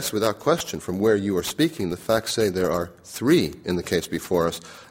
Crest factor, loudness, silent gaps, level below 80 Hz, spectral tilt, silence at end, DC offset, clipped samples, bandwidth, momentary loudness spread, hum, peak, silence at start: 18 dB; -24 LUFS; none; -52 dBFS; -4.5 dB/octave; 0.05 s; under 0.1%; under 0.1%; 16.5 kHz; 8 LU; none; -4 dBFS; 0 s